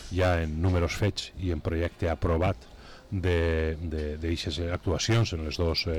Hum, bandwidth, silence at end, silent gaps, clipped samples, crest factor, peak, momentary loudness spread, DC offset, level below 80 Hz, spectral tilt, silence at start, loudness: none; 13 kHz; 0 s; none; under 0.1%; 10 dB; -18 dBFS; 7 LU; under 0.1%; -38 dBFS; -5.5 dB/octave; 0 s; -29 LUFS